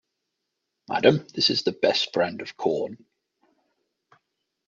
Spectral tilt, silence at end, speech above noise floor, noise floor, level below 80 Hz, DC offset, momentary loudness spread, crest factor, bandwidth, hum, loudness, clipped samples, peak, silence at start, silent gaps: -4.5 dB/octave; 1.7 s; 57 dB; -81 dBFS; -70 dBFS; under 0.1%; 9 LU; 24 dB; 7.6 kHz; none; -24 LUFS; under 0.1%; -2 dBFS; 0.9 s; none